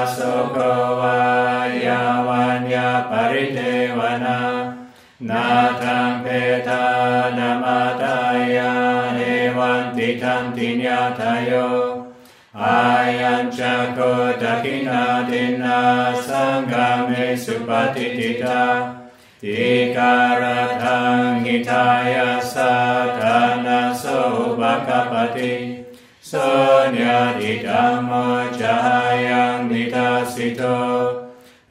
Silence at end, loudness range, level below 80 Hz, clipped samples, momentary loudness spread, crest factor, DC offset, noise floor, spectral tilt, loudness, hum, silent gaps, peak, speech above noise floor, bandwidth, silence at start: 0.35 s; 3 LU; -64 dBFS; under 0.1%; 6 LU; 16 dB; under 0.1%; -43 dBFS; -5.5 dB/octave; -18 LUFS; none; none; -4 dBFS; 25 dB; 15.5 kHz; 0 s